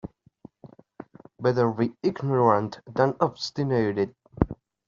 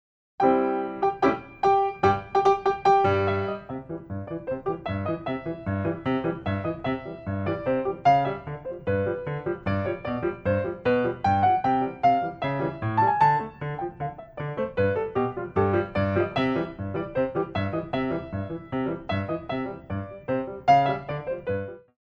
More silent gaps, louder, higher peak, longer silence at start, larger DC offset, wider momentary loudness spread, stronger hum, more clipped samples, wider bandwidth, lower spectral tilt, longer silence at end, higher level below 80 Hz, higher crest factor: neither; about the same, -25 LUFS vs -26 LUFS; about the same, -4 dBFS vs -6 dBFS; second, 0.05 s vs 0.4 s; neither; about the same, 10 LU vs 11 LU; neither; neither; about the same, 7.4 kHz vs 7 kHz; second, -6 dB/octave vs -8 dB/octave; first, 0.35 s vs 0.2 s; about the same, -48 dBFS vs -52 dBFS; about the same, 22 dB vs 18 dB